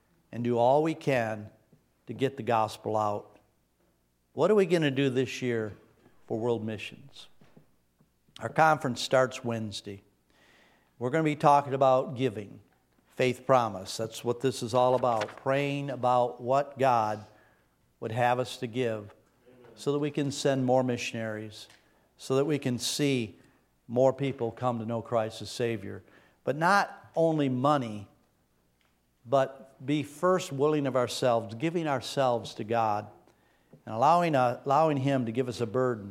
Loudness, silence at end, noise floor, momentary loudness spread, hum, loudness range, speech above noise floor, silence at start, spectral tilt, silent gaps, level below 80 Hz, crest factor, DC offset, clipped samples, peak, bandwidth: -28 LUFS; 0 s; -71 dBFS; 14 LU; none; 4 LU; 43 dB; 0.3 s; -5.5 dB/octave; none; -72 dBFS; 22 dB; under 0.1%; under 0.1%; -8 dBFS; 16 kHz